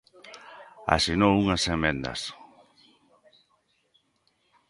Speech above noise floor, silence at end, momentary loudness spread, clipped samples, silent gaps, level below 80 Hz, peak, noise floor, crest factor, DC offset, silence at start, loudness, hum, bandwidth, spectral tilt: 46 dB; 2.35 s; 24 LU; under 0.1%; none; -46 dBFS; -2 dBFS; -71 dBFS; 26 dB; under 0.1%; 0.25 s; -25 LUFS; none; 11.5 kHz; -4.5 dB/octave